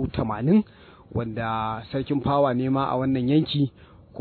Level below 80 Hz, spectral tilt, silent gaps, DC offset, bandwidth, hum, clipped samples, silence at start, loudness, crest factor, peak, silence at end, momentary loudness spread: -48 dBFS; -11 dB/octave; none; under 0.1%; 4.5 kHz; none; under 0.1%; 0 s; -24 LUFS; 14 dB; -10 dBFS; 0 s; 9 LU